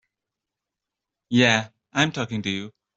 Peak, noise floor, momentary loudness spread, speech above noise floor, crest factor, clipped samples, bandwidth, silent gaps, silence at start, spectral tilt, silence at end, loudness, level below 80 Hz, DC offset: -4 dBFS; -86 dBFS; 11 LU; 64 dB; 22 dB; under 0.1%; 7.8 kHz; none; 1.3 s; -4.5 dB/octave; 0.3 s; -23 LUFS; -62 dBFS; under 0.1%